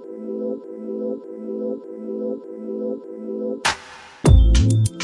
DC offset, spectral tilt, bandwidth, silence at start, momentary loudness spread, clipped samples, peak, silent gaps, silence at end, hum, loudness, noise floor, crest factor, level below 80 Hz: under 0.1%; -6 dB/octave; 11.5 kHz; 0 s; 16 LU; under 0.1%; -2 dBFS; none; 0 s; none; -23 LUFS; -41 dBFS; 20 dB; -24 dBFS